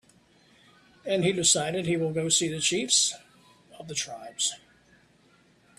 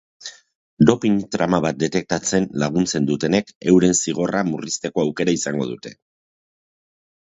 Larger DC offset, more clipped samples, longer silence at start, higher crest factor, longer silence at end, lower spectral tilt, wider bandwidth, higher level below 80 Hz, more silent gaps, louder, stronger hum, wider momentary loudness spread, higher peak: neither; neither; first, 1.05 s vs 0.2 s; about the same, 24 dB vs 20 dB; second, 1.2 s vs 1.35 s; second, -2.5 dB/octave vs -5 dB/octave; first, 14.5 kHz vs 8 kHz; second, -66 dBFS vs -52 dBFS; second, none vs 0.55-0.77 s, 3.55-3.61 s; second, -25 LUFS vs -20 LUFS; neither; first, 17 LU vs 11 LU; second, -6 dBFS vs 0 dBFS